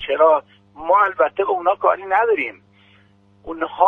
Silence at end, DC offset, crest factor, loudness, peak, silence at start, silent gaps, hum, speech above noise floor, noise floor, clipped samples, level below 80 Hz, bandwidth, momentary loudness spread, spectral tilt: 0 s; under 0.1%; 18 dB; -18 LUFS; 0 dBFS; 0 s; none; none; 36 dB; -54 dBFS; under 0.1%; -58 dBFS; 3.8 kHz; 12 LU; -6 dB/octave